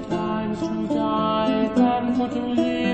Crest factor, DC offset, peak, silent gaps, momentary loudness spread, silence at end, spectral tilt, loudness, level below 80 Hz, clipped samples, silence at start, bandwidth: 14 dB; 0.1%; -6 dBFS; none; 6 LU; 0 s; -7 dB/octave; -22 LUFS; -50 dBFS; under 0.1%; 0 s; 8.6 kHz